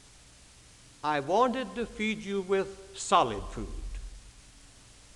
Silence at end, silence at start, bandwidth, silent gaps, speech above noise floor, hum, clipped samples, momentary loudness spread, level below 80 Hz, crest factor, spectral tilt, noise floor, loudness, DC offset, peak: 0.25 s; 0.6 s; 12 kHz; none; 26 dB; none; under 0.1%; 18 LU; -46 dBFS; 22 dB; -4 dB/octave; -55 dBFS; -30 LUFS; under 0.1%; -10 dBFS